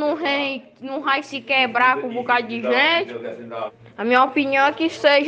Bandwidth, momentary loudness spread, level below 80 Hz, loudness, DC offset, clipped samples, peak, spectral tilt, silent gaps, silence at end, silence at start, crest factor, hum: 8.6 kHz; 15 LU; -70 dBFS; -19 LUFS; under 0.1%; under 0.1%; -4 dBFS; -4 dB/octave; none; 0 s; 0 s; 16 dB; none